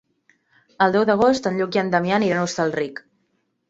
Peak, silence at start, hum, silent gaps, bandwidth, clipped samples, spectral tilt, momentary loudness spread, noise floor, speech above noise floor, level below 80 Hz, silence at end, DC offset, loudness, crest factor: -2 dBFS; 0.8 s; none; none; 8 kHz; under 0.1%; -5.5 dB/octave; 9 LU; -70 dBFS; 50 dB; -60 dBFS; 0.75 s; under 0.1%; -20 LUFS; 18 dB